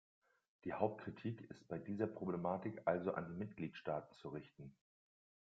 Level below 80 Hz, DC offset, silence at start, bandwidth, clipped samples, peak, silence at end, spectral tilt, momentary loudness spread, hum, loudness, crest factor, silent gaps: -78 dBFS; under 0.1%; 0.65 s; 7.4 kHz; under 0.1%; -20 dBFS; 0.8 s; -7 dB/octave; 12 LU; none; -45 LUFS; 24 dB; none